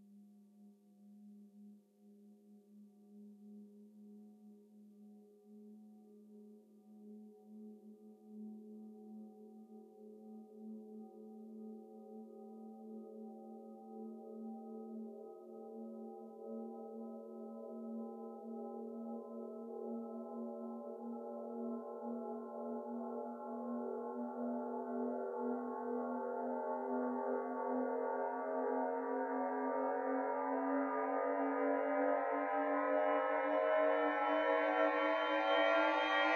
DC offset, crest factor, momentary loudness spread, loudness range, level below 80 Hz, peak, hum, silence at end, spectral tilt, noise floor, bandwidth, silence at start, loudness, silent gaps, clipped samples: under 0.1%; 20 dB; 24 LU; 25 LU; under -90 dBFS; -22 dBFS; none; 0 s; -5.5 dB/octave; -64 dBFS; 6.8 kHz; 0 s; -39 LUFS; none; under 0.1%